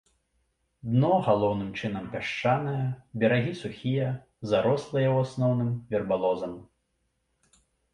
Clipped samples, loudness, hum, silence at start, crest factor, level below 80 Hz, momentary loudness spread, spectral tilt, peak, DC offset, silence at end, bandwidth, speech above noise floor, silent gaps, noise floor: under 0.1%; -27 LUFS; none; 0.85 s; 18 dB; -60 dBFS; 9 LU; -7.5 dB/octave; -10 dBFS; under 0.1%; 1.3 s; 10 kHz; 49 dB; none; -75 dBFS